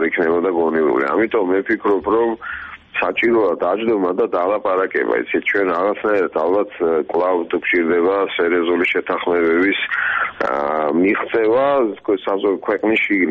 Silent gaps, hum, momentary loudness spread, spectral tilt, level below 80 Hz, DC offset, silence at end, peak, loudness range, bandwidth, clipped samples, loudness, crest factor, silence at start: none; none; 4 LU; -7 dB/octave; -56 dBFS; under 0.1%; 0 s; -4 dBFS; 1 LU; 5.6 kHz; under 0.1%; -17 LUFS; 12 dB; 0 s